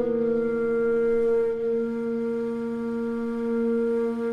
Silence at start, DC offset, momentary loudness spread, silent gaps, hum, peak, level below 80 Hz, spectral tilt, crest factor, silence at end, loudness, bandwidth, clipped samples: 0 s; under 0.1%; 6 LU; none; none; -14 dBFS; -54 dBFS; -8 dB/octave; 10 dB; 0 s; -26 LUFS; 5.4 kHz; under 0.1%